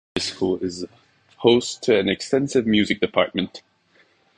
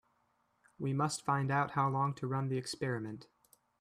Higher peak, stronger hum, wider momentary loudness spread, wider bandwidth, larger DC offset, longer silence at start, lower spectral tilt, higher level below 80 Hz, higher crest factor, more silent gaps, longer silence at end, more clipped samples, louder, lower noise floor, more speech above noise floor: first, -2 dBFS vs -18 dBFS; neither; about the same, 11 LU vs 9 LU; second, 10.5 kHz vs 13.5 kHz; neither; second, 0.15 s vs 0.8 s; about the same, -4.5 dB/octave vs -5.5 dB/octave; first, -54 dBFS vs -72 dBFS; about the same, 20 dB vs 18 dB; neither; first, 0.8 s vs 0.55 s; neither; first, -21 LUFS vs -35 LUFS; second, -60 dBFS vs -76 dBFS; about the same, 39 dB vs 42 dB